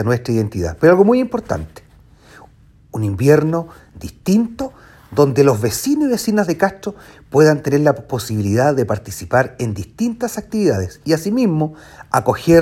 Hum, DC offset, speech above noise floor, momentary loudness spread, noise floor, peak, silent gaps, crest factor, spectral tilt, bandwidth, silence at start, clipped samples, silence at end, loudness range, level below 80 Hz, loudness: none; under 0.1%; 31 dB; 12 LU; -47 dBFS; 0 dBFS; none; 16 dB; -6.5 dB/octave; 16.5 kHz; 0 s; under 0.1%; 0 s; 3 LU; -44 dBFS; -17 LUFS